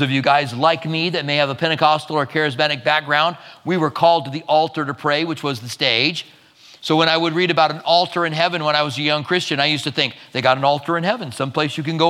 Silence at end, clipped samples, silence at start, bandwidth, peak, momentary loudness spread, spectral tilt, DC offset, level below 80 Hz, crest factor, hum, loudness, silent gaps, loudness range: 0 s; under 0.1%; 0 s; 15.5 kHz; 0 dBFS; 6 LU; -5 dB/octave; under 0.1%; -70 dBFS; 18 dB; none; -18 LUFS; none; 1 LU